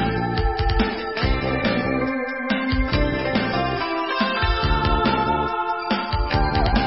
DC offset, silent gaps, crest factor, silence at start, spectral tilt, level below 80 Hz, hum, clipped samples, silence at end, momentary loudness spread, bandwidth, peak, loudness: 0.3%; none; 16 dB; 0 s; -10 dB/octave; -28 dBFS; none; under 0.1%; 0 s; 4 LU; 5.8 kHz; -6 dBFS; -22 LUFS